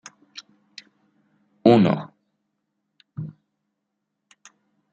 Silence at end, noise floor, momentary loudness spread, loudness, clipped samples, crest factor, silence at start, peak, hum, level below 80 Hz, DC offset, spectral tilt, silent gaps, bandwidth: 1.6 s; -79 dBFS; 29 LU; -19 LUFS; under 0.1%; 24 dB; 0.35 s; -2 dBFS; none; -70 dBFS; under 0.1%; -7.5 dB/octave; none; 7.8 kHz